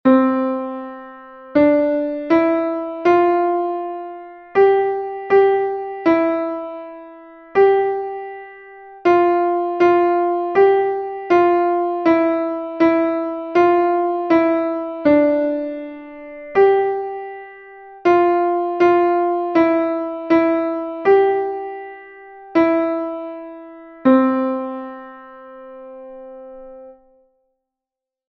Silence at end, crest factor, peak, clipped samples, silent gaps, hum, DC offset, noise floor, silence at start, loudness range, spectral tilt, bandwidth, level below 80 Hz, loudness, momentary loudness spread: 1.35 s; 16 dB; -2 dBFS; under 0.1%; none; none; under 0.1%; -87 dBFS; 0.05 s; 4 LU; -7.5 dB/octave; 6.2 kHz; -58 dBFS; -17 LUFS; 21 LU